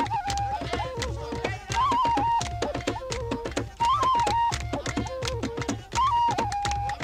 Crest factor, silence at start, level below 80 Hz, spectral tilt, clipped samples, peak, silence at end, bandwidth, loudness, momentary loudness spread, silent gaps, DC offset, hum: 16 dB; 0 s; -40 dBFS; -4.5 dB/octave; under 0.1%; -12 dBFS; 0 s; 15.5 kHz; -27 LUFS; 8 LU; none; under 0.1%; none